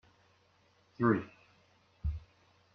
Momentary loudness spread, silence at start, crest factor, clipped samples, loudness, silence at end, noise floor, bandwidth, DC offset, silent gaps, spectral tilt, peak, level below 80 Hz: 17 LU; 1 s; 22 dB; under 0.1%; -35 LUFS; 0.55 s; -69 dBFS; 6.4 kHz; under 0.1%; none; -9.5 dB/octave; -16 dBFS; -50 dBFS